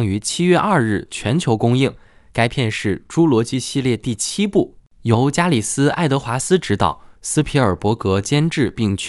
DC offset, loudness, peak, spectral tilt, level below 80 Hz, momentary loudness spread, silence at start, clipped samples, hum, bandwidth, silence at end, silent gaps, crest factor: under 0.1%; -18 LUFS; 0 dBFS; -5.5 dB/octave; -44 dBFS; 6 LU; 0 s; under 0.1%; none; 13.5 kHz; 0 s; none; 18 dB